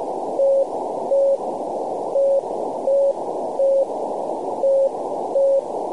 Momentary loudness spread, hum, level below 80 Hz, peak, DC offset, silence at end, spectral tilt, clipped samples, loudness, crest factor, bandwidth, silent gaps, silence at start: 7 LU; none; -68 dBFS; -10 dBFS; 0.4%; 0 s; -6.5 dB/octave; under 0.1%; -21 LUFS; 10 dB; 10.5 kHz; none; 0 s